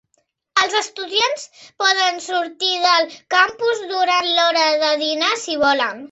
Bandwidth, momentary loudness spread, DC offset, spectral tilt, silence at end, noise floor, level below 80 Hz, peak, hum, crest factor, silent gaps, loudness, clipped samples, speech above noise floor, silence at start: 8.2 kHz; 6 LU; under 0.1%; 0 dB/octave; 0.05 s; -67 dBFS; -64 dBFS; -2 dBFS; none; 18 dB; none; -17 LUFS; under 0.1%; 49 dB; 0.55 s